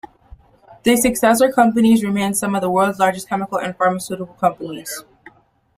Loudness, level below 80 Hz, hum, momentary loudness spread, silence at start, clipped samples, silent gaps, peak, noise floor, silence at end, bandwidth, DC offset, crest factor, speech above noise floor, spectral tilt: -17 LUFS; -50 dBFS; none; 14 LU; 0.7 s; under 0.1%; none; -2 dBFS; -51 dBFS; 0.75 s; 16 kHz; under 0.1%; 18 dB; 34 dB; -4.5 dB/octave